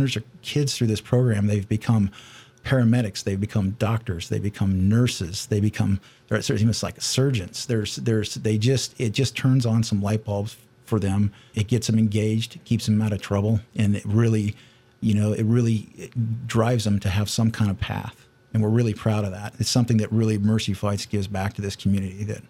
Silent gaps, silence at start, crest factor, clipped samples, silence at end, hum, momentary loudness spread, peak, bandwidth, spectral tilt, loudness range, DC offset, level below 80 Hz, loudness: none; 0 s; 16 dB; under 0.1%; 0.1 s; none; 7 LU; -6 dBFS; 14.5 kHz; -6 dB/octave; 1 LU; under 0.1%; -50 dBFS; -23 LUFS